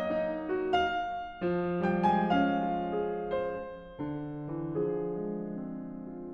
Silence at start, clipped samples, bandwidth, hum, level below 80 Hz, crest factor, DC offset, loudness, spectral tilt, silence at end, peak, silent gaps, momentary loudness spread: 0 s; under 0.1%; 7.2 kHz; none; -56 dBFS; 16 dB; under 0.1%; -32 LUFS; -8 dB/octave; 0 s; -14 dBFS; none; 13 LU